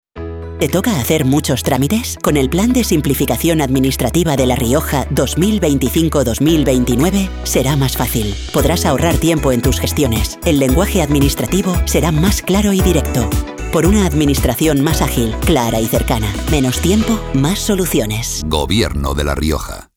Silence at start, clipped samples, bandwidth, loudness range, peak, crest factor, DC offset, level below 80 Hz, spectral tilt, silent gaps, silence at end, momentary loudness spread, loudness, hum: 0.15 s; under 0.1%; 19 kHz; 1 LU; 0 dBFS; 14 dB; under 0.1%; -24 dBFS; -5 dB/octave; none; 0.15 s; 4 LU; -15 LUFS; none